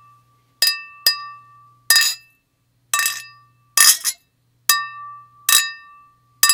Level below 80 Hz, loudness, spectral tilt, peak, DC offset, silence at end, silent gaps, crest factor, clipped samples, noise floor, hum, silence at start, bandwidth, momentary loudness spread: -72 dBFS; -16 LUFS; 4.5 dB/octave; 0 dBFS; under 0.1%; 0 s; none; 22 dB; under 0.1%; -65 dBFS; none; 0.6 s; over 20 kHz; 20 LU